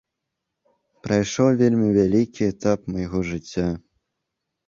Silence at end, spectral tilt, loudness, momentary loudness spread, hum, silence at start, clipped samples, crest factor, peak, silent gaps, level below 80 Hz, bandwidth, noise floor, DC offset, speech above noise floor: 0.9 s; -6.5 dB/octave; -22 LUFS; 10 LU; none; 1.05 s; under 0.1%; 18 dB; -6 dBFS; none; -46 dBFS; 7.4 kHz; -81 dBFS; under 0.1%; 61 dB